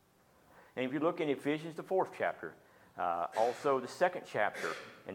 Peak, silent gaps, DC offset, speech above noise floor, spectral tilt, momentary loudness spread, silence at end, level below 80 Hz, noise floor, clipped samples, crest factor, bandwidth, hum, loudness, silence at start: -16 dBFS; none; under 0.1%; 32 dB; -5 dB/octave; 11 LU; 0 s; -80 dBFS; -67 dBFS; under 0.1%; 20 dB; 17 kHz; none; -35 LUFS; 0.55 s